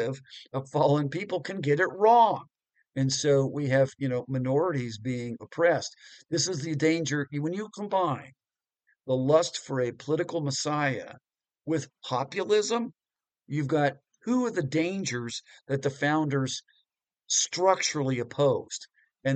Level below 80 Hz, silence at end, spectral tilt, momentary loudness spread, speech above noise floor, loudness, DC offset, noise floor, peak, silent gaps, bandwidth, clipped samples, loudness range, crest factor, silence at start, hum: -70 dBFS; 0 s; -4.5 dB/octave; 13 LU; 54 dB; -27 LUFS; under 0.1%; -81 dBFS; -8 dBFS; none; 9.2 kHz; under 0.1%; 5 LU; 20 dB; 0 s; none